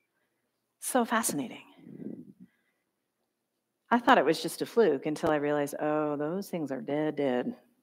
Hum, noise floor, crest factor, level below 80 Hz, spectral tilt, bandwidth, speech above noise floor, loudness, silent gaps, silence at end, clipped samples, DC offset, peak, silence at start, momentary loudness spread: none; -82 dBFS; 24 dB; -74 dBFS; -4 dB/octave; 16 kHz; 54 dB; -29 LUFS; none; 0.25 s; under 0.1%; under 0.1%; -8 dBFS; 0.8 s; 19 LU